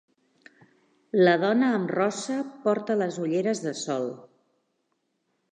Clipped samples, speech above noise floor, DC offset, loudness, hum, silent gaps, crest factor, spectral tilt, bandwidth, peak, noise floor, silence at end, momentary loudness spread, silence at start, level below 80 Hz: under 0.1%; 51 dB; under 0.1%; -26 LUFS; none; none; 18 dB; -5.5 dB/octave; 10 kHz; -8 dBFS; -76 dBFS; 1.3 s; 10 LU; 1.15 s; -82 dBFS